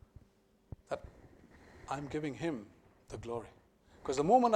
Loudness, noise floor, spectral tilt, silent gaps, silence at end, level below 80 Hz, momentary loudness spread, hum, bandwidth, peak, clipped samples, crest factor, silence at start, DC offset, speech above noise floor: -37 LUFS; -68 dBFS; -6 dB/octave; none; 0 s; -62 dBFS; 24 LU; none; 11 kHz; -14 dBFS; under 0.1%; 22 dB; 0.9 s; under 0.1%; 36 dB